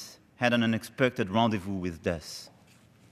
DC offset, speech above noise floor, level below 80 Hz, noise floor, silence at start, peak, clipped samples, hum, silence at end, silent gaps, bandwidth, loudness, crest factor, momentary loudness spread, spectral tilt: under 0.1%; 30 dB; -62 dBFS; -58 dBFS; 0 s; -10 dBFS; under 0.1%; none; 0.65 s; none; 14.5 kHz; -29 LUFS; 20 dB; 14 LU; -5.5 dB/octave